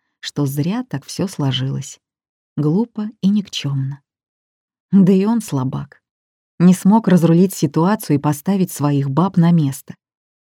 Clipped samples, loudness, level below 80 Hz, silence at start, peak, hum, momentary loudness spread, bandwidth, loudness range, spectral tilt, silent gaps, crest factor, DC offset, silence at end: under 0.1%; -17 LUFS; -62 dBFS; 0.25 s; -2 dBFS; none; 14 LU; 16.5 kHz; 6 LU; -7 dB/octave; 2.29-2.56 s, 4.29-4.68 s, 4.80-4.89 s, 6.11-6.58 s; 16 dB; under 0.1%; 0.6 s